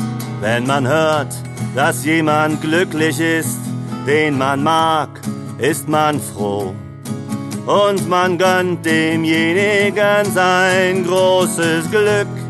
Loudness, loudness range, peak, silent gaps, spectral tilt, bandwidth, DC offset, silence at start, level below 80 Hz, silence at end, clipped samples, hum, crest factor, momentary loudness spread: -16 LUFS; 4 LU; -2 dBFS; none; -5 dB/octave; 13 kHz; under 0.1%; 0 s; -52 dBFS; 0 s; under 0.1%; none; 14 dB; 11 LU